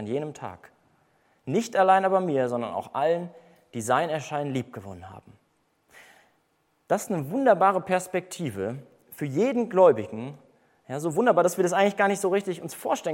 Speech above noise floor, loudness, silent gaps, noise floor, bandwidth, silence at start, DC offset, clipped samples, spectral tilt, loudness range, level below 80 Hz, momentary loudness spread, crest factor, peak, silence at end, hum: 45 dB; -25 LUFS; none; -70 dBFS; 16.5 kHz; 0 s; under 0.1%; under 0.1%; -5.5 dB/octave; 8 LU; -72 dBFS; 20 LU; 20 dB; -6 dBFS; 0 s; none